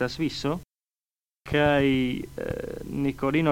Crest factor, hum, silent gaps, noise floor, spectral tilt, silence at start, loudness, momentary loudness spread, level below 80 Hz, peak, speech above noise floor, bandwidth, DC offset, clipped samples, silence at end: 18 dB; none; none; under -90 dBFS; -6.5 dB/octave; 0 s; -26 LUFS; 12 LU; -46 dBFS; -8 dBFS; over 65 dB; 16.5 kHz; under 0.1%; under 0.1%; 0 s